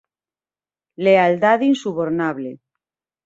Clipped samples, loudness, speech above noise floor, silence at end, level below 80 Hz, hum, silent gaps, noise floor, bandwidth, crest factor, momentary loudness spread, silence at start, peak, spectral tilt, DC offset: under 0.1%; -17 LUFS; over 73 dB; 0.7 s; -64 dBFS; none; none; under -90 dBFS; 8 kHz; 18 dB; 12 LU; 1 s; -2 dBFS; -6.5 dB/octave; under 0.1%